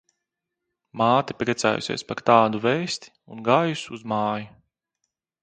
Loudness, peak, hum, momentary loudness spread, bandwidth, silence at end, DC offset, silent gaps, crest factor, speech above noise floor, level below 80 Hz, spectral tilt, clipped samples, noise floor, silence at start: -23 LUFS; -2 dBFS; none; 14 LU; 9.4 kHz; 0.95 s; under 0.1%; none; 22 dB; 60 dB; -64 dBFS; -5 dB/octave; under 0.1%; -83 dBFS; 0.95 s